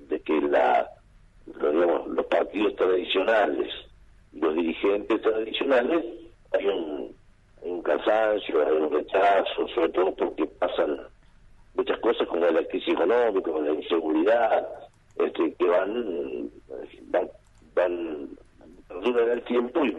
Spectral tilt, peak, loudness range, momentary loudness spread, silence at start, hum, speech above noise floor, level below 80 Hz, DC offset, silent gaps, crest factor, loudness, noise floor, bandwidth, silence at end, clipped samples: -5.5 dB/octave; -10 dBFS; 4 LU; 14 LU; 0 s; none; 30 dB; -56 dBFS; under 0.1%; none; 14 dB; -25 LUFS; -54 dBFS; 7.8 kHz; 0 s; under 0.1%